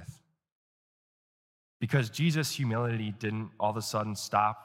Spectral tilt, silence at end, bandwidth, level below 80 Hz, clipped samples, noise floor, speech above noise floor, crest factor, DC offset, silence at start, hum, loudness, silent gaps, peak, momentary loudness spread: -5.5 dB/octave; 0 s; 16.5 kHz; -70 dBFS; under 0.1%; -51 dBFS; 21 dB; 22 dB; under 0.1%; 0 s; none; -31 LUFS; 0.52-1.80 s; -10 dBFS; 7 LU